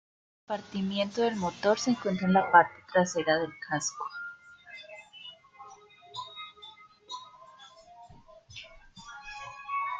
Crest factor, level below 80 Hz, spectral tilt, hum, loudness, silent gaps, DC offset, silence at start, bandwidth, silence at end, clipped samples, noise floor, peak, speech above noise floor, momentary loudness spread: 26 dB; -66 dBFS; -4.5 dB/octave; none; -28 LUFS; none; under 0.1%; 0.5 s; 9.2 kHz; 0 s; under 0.1%; -53 dBFS; -6 dBFS; 26 dB; 24 LU